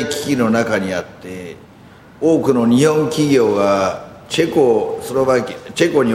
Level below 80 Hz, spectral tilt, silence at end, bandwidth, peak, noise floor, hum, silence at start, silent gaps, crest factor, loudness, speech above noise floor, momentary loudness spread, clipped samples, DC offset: -52 dBFS; -5.5 dB/octave; 0 s; 16 kHz; -2 dBFS; -42 dBFS; none; 0 s; none; 14 dB; -16 LUFS; 27 dB; 15 LU; under 0.1%; under 0.1%